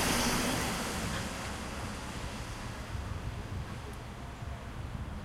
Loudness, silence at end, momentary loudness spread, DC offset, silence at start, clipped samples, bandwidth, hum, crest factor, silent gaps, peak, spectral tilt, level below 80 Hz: -37 LUFS; 0 s; 13 LU; under 0.1%; 0 s; under 0.1%; 16.5 kHz; none; 18 dB; none; -18 dBFS; -3.5 dB/octave; -44 dBFS